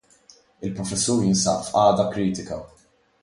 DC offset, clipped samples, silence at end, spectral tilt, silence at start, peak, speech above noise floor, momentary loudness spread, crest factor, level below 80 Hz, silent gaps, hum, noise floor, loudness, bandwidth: under 0.1%; under 0.1%; 0.55 s; -4.5 dB/octave; 0.6 s; -4 dBFS; 33 dB; 15 LU; 18 dB; -52 dBFS; none; none; -55 dBFS; -22 LUFS; 11.5 kHz